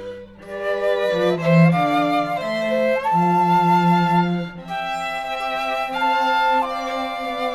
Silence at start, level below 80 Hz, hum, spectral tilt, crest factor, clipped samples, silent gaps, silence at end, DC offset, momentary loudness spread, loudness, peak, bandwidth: 0 s; -54 dBFS; none; -7 dB/octave; 16 dB; under 0.1%; none; 0 s; under 0.1%; 10 LU; -19 LUFS; -4 dBFS; 13 kHz